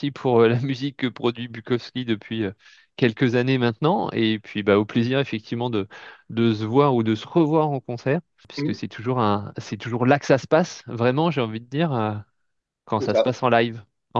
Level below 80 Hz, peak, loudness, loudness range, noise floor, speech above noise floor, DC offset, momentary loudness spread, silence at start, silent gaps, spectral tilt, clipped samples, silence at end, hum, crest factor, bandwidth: -66 dBFS; -2 dBFS; -23 LUFS; 2 LU; -76 dBFS; 54 dB; under 0.1%; 10 LU; 0 s; none; -7 dB/octave; under 0.1%; 0 s; none; 20 dB; 7.4 kHz